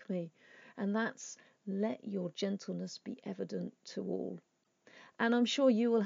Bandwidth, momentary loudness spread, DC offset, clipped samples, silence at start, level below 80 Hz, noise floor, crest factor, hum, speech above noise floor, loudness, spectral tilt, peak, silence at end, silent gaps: 7.6 kHz; 19 LU; under 0.1%; under 0.1%; 0 s; under -90 dBFS; -65 dBFS; 18 dB; none; 30 dB; -36 LUFS; -5.5 dB/octave; -18 dBFS; 0 s; none